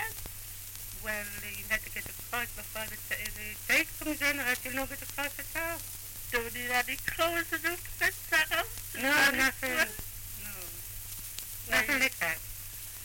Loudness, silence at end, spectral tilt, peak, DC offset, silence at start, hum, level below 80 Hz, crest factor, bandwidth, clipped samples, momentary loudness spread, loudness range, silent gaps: -31 LUFS; 0 s; -2 dB/octave; -14 dBFS; under 0.1%; 0 s; none; -50 dBFS; 20 dB; 17 kHz; under 0.1%; 13 LU; 4 LU; none